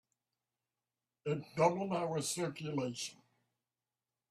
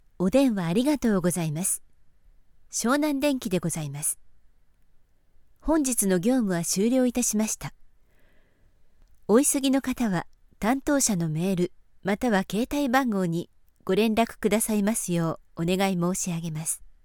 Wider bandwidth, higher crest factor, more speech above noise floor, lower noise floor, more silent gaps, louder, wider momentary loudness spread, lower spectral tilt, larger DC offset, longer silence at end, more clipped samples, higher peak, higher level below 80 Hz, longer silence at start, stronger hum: second, 14.5 kHz vs 19 kHz; first, 24 dB vs 18 dB; first, over 54 dB vs 33 dB; first, under -90 dBFS vs -58 dBFS; neither; second, -37 LUFS vs -25 LUFS; first, 11 LU vs 8 LU; about the same, -4.5 dB/octave vs -4.5 dB/octave; neither; first, 1.15 s vs 0.15 s; neither; second, -16 dBFS vs -8 dBFS; second, -78 dBFS vs -50 dBFS; first, 1.25 s vs 0.2 s; neither